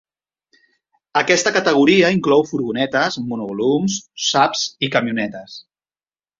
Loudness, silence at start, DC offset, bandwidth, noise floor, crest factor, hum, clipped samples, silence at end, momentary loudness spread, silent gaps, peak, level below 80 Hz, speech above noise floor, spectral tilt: -17 LUFS; 1.15 s; under 0.1%; 7.6 kHz; under -90 dBFS; 18 dB; none; under 0.1%; 0.8 s; 11 LU; none; -2 dBFS; -60 dBFS; over 73 dB; -4 dB/octave